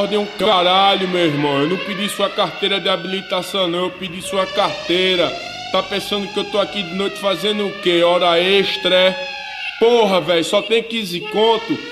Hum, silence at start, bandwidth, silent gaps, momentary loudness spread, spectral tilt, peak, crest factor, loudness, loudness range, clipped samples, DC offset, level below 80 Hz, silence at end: none; 0 s; 15 kHz; none; 8 LU; -4 dB/octave; 0 dBFS; 16 dB; -17 LUFS; 4 LU; under 0.1%; under 0.1%; -56 dBFS; 0 s